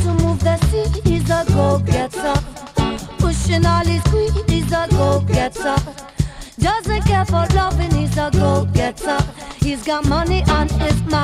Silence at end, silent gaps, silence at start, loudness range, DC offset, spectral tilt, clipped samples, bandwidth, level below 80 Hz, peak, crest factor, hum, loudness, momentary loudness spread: 0 s; none; 0 s; 1 LU; under 0.1%; -6 dB/octave; under 0.1%; 14.5 kHz; -24 dBFS; -2 dBFS; 14 dB; none; -18 LUFS; 6 LU